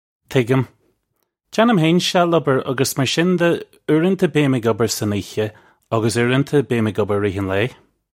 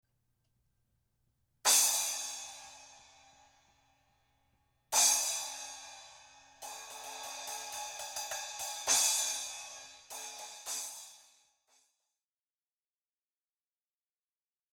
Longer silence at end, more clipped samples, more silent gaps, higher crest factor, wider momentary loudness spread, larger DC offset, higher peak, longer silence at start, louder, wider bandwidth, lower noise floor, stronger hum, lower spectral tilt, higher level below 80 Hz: second, 0.45 s vs 3.55 s; neither; neither; second, 18 dB vs 26 dB; second, 9 LU vs 23 LU; neither; first, -2 dBFS vs -12 dBFS; second, 0.3 s vs 1.65 s; first, -18 LUFS vs -31 LUFS; second, 16.5 kHz vs over 20 kHz; second, -71 dBFS vs under -90 dBFS; neither; first, -5.5 dB/octave vs 3 dB/octave; first, -56 dBFS vs -78 dBFS